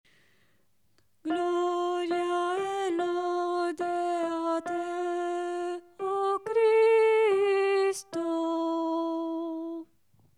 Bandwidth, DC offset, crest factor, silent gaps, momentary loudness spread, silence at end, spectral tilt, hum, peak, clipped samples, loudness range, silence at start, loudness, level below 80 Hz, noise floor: 12.5 kHz; under 0.1%; 14 dB; none; 11 LU; 0.55 s; -3.5 dB/octave; none; -16 dBFS; under 0.1%; 5 LU; 1.25 s; -28 LUFS; -80 dBFS; -72 dBFS